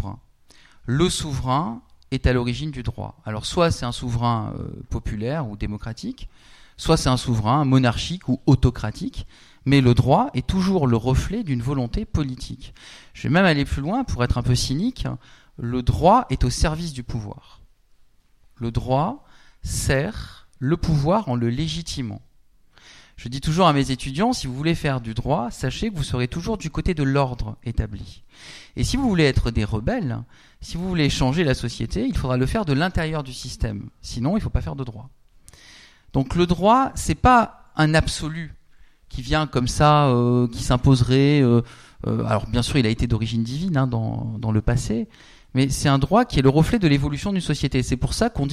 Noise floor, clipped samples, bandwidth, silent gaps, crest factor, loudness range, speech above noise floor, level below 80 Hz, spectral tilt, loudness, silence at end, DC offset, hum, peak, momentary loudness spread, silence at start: -55 dBFS; under 0.1%; 14 kHz; none; 18 dB; 6 LU; 33 dB; -34 dBFS; -6 dB/octave; -22 LUFS; 0 s; under 0.1%; none; -2 dBFS; 15 LU; 0 s